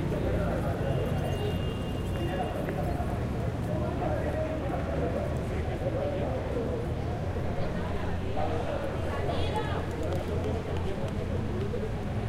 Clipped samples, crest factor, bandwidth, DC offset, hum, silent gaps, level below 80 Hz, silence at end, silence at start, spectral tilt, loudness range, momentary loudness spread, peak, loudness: under 0.1%; 14 dB; 15.5 kHz; under 0.1%; none; none; -38 dBFS; 0 s; 0 s; -7.5 dB/octave; 1 LU; 3 LU; -16 dBFS; -31 LUFS